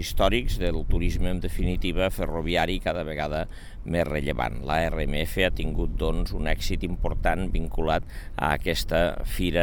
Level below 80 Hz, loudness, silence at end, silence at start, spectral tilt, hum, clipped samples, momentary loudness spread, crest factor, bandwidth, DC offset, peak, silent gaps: -28 dBFS; -27 LUFS; 0 s; 0 s; -5.5 dB/octave; none; under 0.1%; 5 LU; 18 dB; 19 kHz; 0.3%; -6 dBFS; none